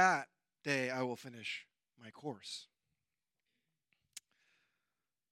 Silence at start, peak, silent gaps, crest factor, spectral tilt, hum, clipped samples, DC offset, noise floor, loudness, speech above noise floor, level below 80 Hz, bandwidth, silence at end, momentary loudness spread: 0 s; -16 dBFS; none; 26 dB; -3.5 dB/octave; none; under 0.1%; under 0.1%; under -90 dBFS; -40 LUFS; over 53 dB; under -90 dBFS; 16 kHz; 1.1 s; 20 LU